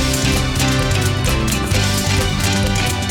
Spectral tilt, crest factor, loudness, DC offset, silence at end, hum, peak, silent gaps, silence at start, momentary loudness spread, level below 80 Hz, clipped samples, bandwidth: -4 dB/octave; 12 dB; -17 LUFS; under 0.1%; 0 s; none; -4 dBFS; none; 0 s; 1 LU; -24 dBFS; under 0.1%; 18.5 kHz